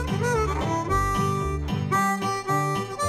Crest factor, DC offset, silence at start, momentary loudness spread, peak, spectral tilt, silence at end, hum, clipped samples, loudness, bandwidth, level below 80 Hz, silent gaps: 14 dB; under 0.1%; 0 s; 4 LU; -10 dBFS; -5.5 dB/octave; 0 s; none; under 0.1%; -25 LUFS; 16 kHz; -36 dBFS; none